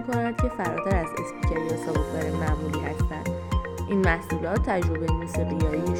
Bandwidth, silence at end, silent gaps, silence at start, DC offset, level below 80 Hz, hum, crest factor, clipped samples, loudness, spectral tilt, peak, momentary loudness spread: 17 kHz; 0 s; none; 0 s; under 0.1%; -32 dBFS; none; 16 dB; under 0.1%; -27 LUFS; -7 dB/octave; -8 dBFS; 5 LU